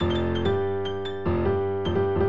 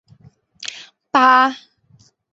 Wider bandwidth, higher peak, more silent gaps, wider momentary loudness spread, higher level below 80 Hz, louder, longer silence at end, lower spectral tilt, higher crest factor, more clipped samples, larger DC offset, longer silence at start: about the same, 7.4 kHz vs 8 kHz; second, -12 dBFS vs -2 dBFS; neither; second, 4 LU vs 24 LU; first, -42 dBFS vs -68 dBFS; second, -26 LUFS vs -14 LUFS; second, 0 s vs 0.75 s; first, -8.5 dB/octave vs -2.5 dB/octave; second, 12 dB vs 18 dB; neither; first, 1% vs under 0.1%; second, 0 s vs 0.6 s